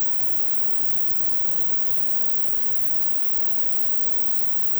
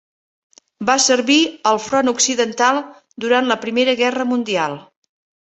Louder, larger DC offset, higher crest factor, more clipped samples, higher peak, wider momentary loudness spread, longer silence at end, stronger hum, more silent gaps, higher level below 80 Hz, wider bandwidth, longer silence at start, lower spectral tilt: first, -13 LUFS vs -17 LUFS; neither; second, 12 dB vs 18 dB; neither; about the same, -4 dBFS vs -2 dBFS; second, 0 LU vs 10 LU; second, 0 s vs 0.6 s; neither; neither; first, -54 dBFS vs -64 dBFS; first, over 20 kHz vs 8.4 kHz; second, 0 s vs 0.8 s; about the same, -3 dB/octave vs -2 dB/octave